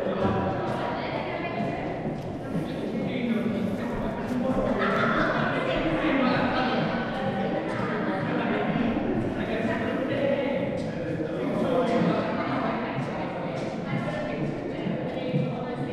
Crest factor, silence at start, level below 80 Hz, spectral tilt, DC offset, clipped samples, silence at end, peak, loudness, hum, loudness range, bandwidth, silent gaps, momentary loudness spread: 16 dB; 0 s; -48 dBFS; -7.5 dB/octave; under 0.1%; under 0.1%; 0 s; -10 dBFS; -27 LUFS; none; 4 LU; 12 kHz; none; 7 LU